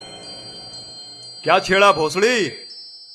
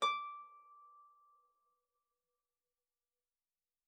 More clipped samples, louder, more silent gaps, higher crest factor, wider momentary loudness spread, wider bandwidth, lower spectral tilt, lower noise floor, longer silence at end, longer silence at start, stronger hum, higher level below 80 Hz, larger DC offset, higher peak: neither; first, -17 LUFS vs -42 LUFS; neither; about the same, 20 dB vs 24 dB; second, 20 LU vs 23 LU; first, 14 kHz vs 6 kHz; first, -3 dB/octave vs 4.5 dB/octave; second, -39 dBFS vs under -90 dBFS; second, 0 s vs 2.85 s; about the same, 0 s vs 0 s; neither; first, -54 dBFS vs under -90 dBFS; neither; first, -2 dBFS vs -24 dBFS